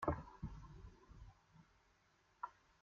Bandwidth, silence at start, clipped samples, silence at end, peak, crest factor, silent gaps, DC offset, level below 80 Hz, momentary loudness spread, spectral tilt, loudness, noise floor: 7.2 kHz; 0 s; under 0.1%; 0.3 s; -22 dBFS; 28 dB; none; under 0.1%; -60 dBFS; 21 LU; -7.5 dB/octave; -53 LUFS; -76 dBFS